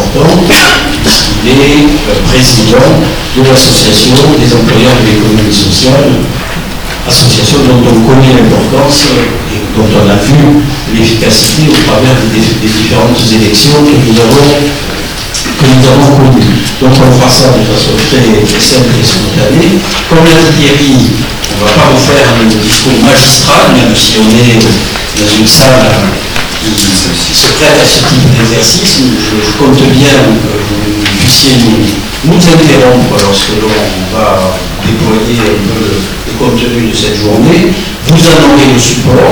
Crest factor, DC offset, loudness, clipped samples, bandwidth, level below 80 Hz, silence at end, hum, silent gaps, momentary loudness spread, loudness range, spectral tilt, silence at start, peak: 4 dB; under 0.1%; -5 LUFS; 8%; over 20 kHz; -20 dBFS; 0 s; none; none; 7 LU; 2 LU; -4.5 dB/octave; 0 s; 0 dBFS